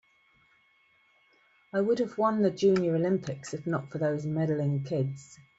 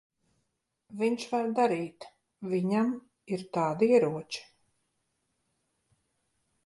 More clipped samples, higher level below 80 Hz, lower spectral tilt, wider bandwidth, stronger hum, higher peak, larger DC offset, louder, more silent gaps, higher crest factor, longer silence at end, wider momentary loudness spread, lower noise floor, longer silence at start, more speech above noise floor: neither; first, -70 dBFS vs -76 dBFS; about the same, -7.5 dB/octave vs -6.5 dB/octave; second, 8 kHz vs 11.5 kHz; neither; about the same, -14 dBFS vs -12 dBFS; neither; about the same, -29 LUFS vs -29 LUFS; neither; about the same, 16 dB vs 20 dB; second, 0.25 s vs 2.25 s; second, 10 LU vs 17 LU; second, -66 dBFS vs -80 dBFS; first, 1.75 s vs 0.9 s; second, 38 dB vs 52 dB